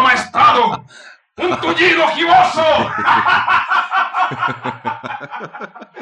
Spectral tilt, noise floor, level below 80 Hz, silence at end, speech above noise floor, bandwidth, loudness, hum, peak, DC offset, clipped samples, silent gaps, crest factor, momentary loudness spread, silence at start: -4 dB/octave; -42 dBFS; -56 dBFS; 0 s; 27 dB; 11 kHz; -14 LUFS; none; -2 dBFS; under 0.1%; under 0.1%; none; 14 dB; 16 LU; 0 s